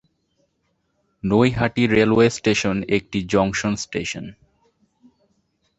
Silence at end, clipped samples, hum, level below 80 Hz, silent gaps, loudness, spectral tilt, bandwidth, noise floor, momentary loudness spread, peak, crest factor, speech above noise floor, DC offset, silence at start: 1.45 s; under 0.1%; none; -48 dBFS; none; -20 LUFS; -5.5 dB/octave; 8.2 kHz; -70 dBFS; 12 LU; -2 dBFS; 20 dB; 51 dB; under 0.1%; 1.25 s